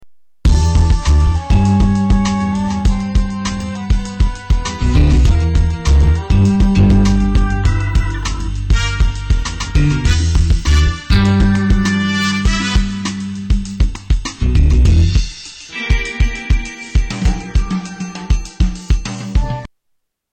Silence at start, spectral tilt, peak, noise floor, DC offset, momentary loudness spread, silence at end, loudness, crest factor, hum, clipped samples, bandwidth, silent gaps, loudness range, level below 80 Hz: 0 s; -6 dB/octave; -4 dBFS; -66 dBFS; under 0.1%; 9 LU; 0.65 s; -15 LUFS; 10 dB; none; under 0.1%; 9 kHz; none; 6 LU; -16 dBFS